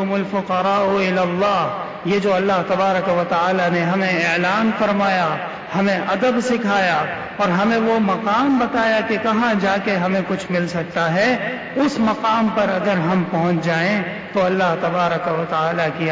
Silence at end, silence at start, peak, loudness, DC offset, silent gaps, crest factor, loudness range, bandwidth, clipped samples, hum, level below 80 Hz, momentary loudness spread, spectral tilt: 0 s; 0 s; -8 dBFS; -18 LUFS; under 0.1%; none; 10 dB; 1 LU; 7.8 kHz; under 0.1%; none; -54 dBFS; 4 LU; -6 dB/octave